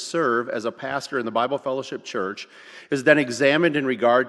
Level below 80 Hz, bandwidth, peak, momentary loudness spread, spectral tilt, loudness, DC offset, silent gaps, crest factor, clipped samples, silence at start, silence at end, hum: -68 dBFS; 12 kHz; 0 dBFS; 11 LU; -4.5 dB/octave; -22 LUFS; under 0.1%; none; 22 dB; under 0.1%; 0 s; 0 s; none